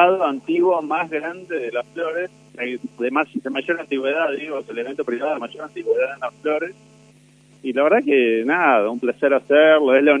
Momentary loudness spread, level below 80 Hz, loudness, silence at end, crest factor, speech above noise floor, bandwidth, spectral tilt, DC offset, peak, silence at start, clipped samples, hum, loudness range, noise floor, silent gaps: 13 LU; -72 dBFS; -20 LUFS; 0 s; 20 dB; 32 dB; 10 kHz; -5.5 dB/octave; under 0.1%; 0 dBFS; 0 s; under 0.1%; 50 Hz at -55 dBFS; 7 LU; -51 dBFS; none